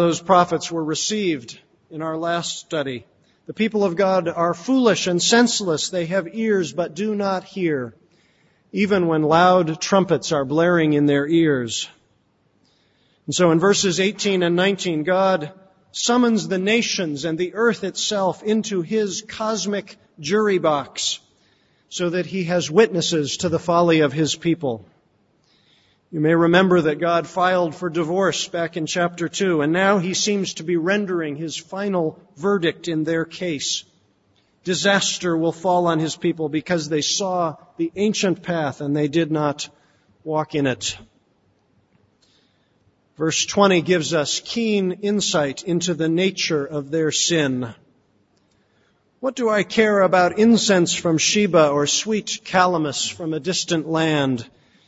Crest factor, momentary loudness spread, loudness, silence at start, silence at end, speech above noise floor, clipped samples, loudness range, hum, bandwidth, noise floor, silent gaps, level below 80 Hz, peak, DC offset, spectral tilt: 20 dB; 10 LU; -20 LUFS; 0 s; 0.4 s; 43 dB; under 0.1%; 5 LU; none; 8 kHz; -63 dBFS; none; -62 dBFS; 0 dBFS; under 0.1%; -4 dB/octave